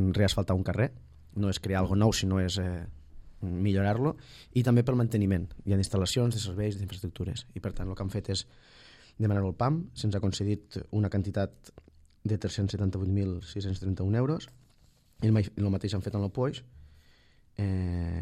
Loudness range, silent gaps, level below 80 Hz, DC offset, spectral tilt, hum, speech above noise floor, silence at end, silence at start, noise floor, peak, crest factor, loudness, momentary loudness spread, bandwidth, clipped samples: 4 LU; none; -50 dBFS; under 0.1%; -6.5 dB/octave; none; 33 dB; 0 s; 0 s; -62 dBFS; -12 dBFS; 18 dB; -30 LUFS; 11 LU; 13.5 kHz; under 0.1%